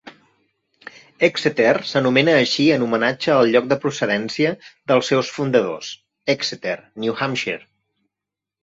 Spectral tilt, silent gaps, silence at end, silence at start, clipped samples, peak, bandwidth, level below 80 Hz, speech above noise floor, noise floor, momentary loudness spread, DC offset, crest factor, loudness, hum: -5 dB/octave; none; 1.05 s; 0.05 s; under 0.1%; -2 dBFS; 8 kHz; -62 dBFS; 67 dB; -86 dBFS; 12 LU; under 0.1%; 18 dB; -19 LUFS; none